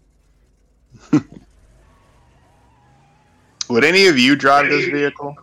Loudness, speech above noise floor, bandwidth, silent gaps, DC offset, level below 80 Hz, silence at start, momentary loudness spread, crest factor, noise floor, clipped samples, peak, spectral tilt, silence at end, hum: -14 LUFS; 42 dB; 16.5 kHz; none; under 0.1%; -56 dBFS; 1.1 s; 10 LU; 16 dB; -56 dBFS; under 0.1%; -2 dBFS; -4 dB/octave; 0.1 s; none